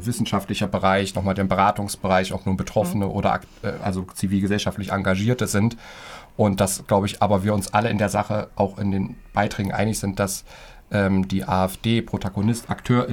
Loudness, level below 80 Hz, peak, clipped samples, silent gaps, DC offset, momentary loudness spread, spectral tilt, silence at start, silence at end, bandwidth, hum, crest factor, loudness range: -23 LUFS; -46 dBFS; -4 dBFS; under 0.1%; none; under 0.1%; 7 LU; -5.5 dB/octave; 0 s; 0 s; 17.5 kHz; none; 18 dB; 2 LU